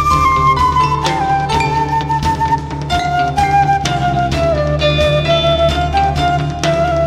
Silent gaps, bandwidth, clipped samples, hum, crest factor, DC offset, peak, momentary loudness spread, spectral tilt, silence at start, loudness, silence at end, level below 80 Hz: none; 14 kHz; under 0.1%; none; 14 dB; under 0.1%; 0 dBFS; 4 LU; -5.5 dB/octave; 0 s; -14 LUFS; 0 s; -26 dBFS